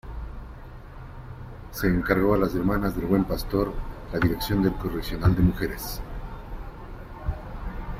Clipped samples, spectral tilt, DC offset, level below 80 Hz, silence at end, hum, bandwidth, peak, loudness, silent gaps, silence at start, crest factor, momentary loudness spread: under 0.1%; -7 dB/octave; under 0.1%; -36 dBFS; 0 s; none; 16 kHz; -6 dBFS; -26 LUFS; none; 0.05 s; 20 dB; 20 LU